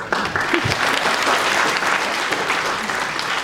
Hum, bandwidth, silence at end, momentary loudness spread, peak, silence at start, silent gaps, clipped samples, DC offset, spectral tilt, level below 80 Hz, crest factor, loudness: none; 16.5 kHz; 0 s; 4 LU; -2 dBFS; 0 s; none; under 0.1%; under 0.1%; -2.5 dB/octave; -50 dBFS; 18 dB; -18 LUFS